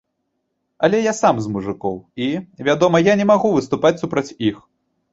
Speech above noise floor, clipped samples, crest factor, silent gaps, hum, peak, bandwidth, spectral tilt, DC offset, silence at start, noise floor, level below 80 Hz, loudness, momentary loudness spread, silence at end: 55 dB; under 0.1%; 18 dB; none; none; -2 dBFS; 8 kHz; -5.5 dB/octave; under 0.1%; 0.8 s; -73 dBFS; -54 dBFS; -18 LUFS; 10 LU; 0.55 s